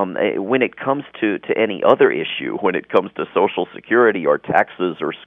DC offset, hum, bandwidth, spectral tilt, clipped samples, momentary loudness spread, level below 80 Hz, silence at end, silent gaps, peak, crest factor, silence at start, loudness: under 0.1%; none; 3.9 kHz; -8 dB/octave; under 0.1%; 8 LU; -66 dBFS; 0.1 s; none; 0 dBFS; 18 dB; 0 s; -18 LUFS